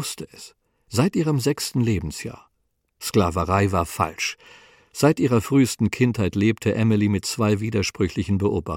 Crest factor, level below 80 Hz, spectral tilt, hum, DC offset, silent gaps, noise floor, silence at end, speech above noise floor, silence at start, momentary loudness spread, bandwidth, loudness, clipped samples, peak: 18 dB; -46 dBFS; -6 dB/octave; none; under 0.1%; none; -72 dBFS; 0 s; 50 dB; 0 s; 12 LU; 17 kHz; -22 LUFS; under 0.1%; -6 dBFS